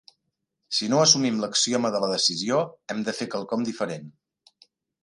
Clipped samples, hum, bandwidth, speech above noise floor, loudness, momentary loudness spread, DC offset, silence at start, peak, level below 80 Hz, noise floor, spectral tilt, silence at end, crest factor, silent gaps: under 0.1%; none; 11.5 kHz; 55 dB; -23 LUFS; 13 LU; under 0.1%; 0.7 s; -4 dBFS; -74 dBFS; -79 dBFS; -3 dB/octave; 0.95 s; 22 dB; none